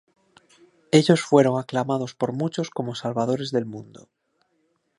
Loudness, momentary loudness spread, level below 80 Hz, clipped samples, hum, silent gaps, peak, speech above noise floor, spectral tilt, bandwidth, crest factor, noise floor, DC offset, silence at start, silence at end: -23 LUFS; 11 LU; -70 dBFS; under 0.1%; none; none; -2 dBFS; 48 dB; -6 dB/octave; 11.5 kHz; 22 dB; -70 dBFS; under 0.1%; 0.95 s; 1.15 s